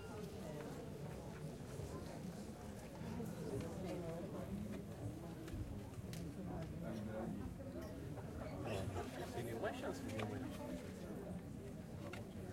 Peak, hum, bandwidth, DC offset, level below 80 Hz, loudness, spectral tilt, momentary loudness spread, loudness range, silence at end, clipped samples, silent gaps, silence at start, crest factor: -30 dBFS; none; 16.5 kHz; under 0.1%; -60 dBFS; -48 LUFS; -6.5 dB/octave; 6 LU; 2 LU; 0 s; under 0.1%; none; 0 s; 18 dB